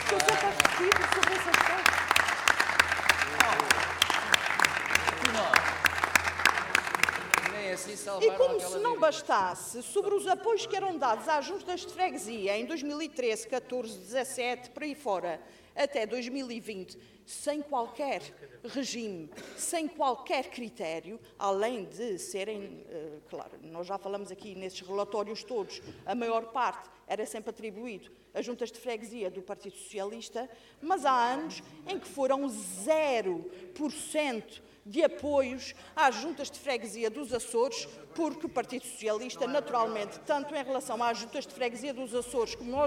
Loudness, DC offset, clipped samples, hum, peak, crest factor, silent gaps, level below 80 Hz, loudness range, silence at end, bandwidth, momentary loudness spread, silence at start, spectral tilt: -30 LUFS; under 0.1%; under 0.1%; none; -6 dBFS; 24 dB; none; -62 dBFS; 12 LU; 0 s; 18 kHz; 17 LU; 0 s; -2 dB/octave